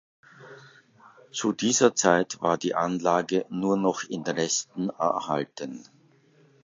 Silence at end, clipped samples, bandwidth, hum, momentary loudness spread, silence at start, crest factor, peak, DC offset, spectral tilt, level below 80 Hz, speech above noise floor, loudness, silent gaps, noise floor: 0.85 s; under 0.1%; 7.8 kHz; none; 12 LU; 0.4 s; 22 dB; -4 dBFS; under 0.1%; -3.5 dB/octave; -70 dBFS; 34 dB; -26 LUFS; none; -60 dBFS